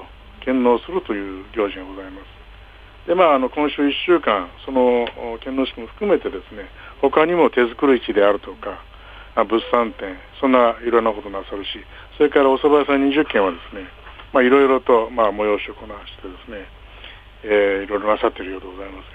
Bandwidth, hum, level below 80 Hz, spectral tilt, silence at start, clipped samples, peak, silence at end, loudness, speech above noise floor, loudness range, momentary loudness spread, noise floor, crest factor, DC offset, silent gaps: 4.9 kHz; none; -44 dBFS; -7 dB/octave; 0 s; under 0.1%; -2 dBFS; 0 s; -18 LUFS; 23 dB; 4 LU; 20 LU; -42 dBFS; 18 dB; under 0.1%; none